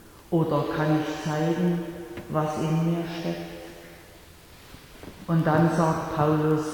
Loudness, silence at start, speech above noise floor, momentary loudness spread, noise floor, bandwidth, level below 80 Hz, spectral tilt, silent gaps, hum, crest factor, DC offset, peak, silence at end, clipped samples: -25 LUFS; 0.05 s; 24 dB; 20 LU; -49 dBFS; 18.5 kHz; -54 dBFS; -7.5 dB/octave; none; none; 16 dB; under 0.1%; -10 dBFS; 0 s; under 0.1%